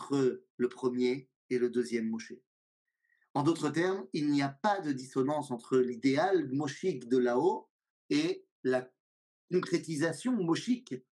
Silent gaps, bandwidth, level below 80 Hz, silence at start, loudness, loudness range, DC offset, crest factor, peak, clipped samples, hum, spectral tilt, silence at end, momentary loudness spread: 0.50-0.58 s, 1.36-1.49 s, 2.47-2.85 s, 3.30-3.34 s, 7.70-7.79 s, 7.90-8.09 s, 8.51-8.63 s, 9.00-9.48 s; 11.5 kHz; -88 dBFS; 0 s; -32 LUFS; 3 LU; under 0.1%; 16 dB; -16 dBFS; under 0.1%; none; -6 dB/octave; 0.15 s; 7 LU